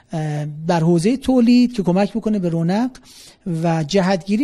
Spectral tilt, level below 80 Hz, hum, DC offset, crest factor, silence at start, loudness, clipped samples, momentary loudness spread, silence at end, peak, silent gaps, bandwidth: -7 dB/octave; -48 dBFS; none; under 0.1%; 14 dB; 0.1 s; -18 LUFS; under 0.1%; 10 LU; 0 s; -4 dBFS; none; 12 kHz